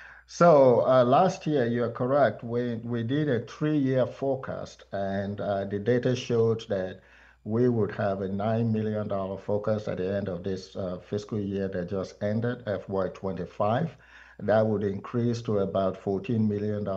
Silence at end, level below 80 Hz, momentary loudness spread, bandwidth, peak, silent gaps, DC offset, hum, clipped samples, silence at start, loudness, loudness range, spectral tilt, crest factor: 0 s; -62 dBFS; 12 LU; 7.8 kHz; -8 dBFS; none; under 0.1%; none; under 0.1%; 0 s; -27 LUFS; 6 LU; -7.5 dB/octave; 18 dB